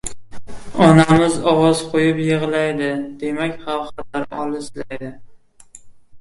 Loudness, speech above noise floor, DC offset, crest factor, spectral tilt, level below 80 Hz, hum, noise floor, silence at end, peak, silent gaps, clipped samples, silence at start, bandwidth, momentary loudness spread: -17 LUFS; 27 dB; under 0.1%; 18 dB; -6 dB/octave; -46 dBFS; none; -44 dBFS; 0 s; 0 dBFS; none; under 0.1%; 0.05 s; 11.5 kHz; 18 LU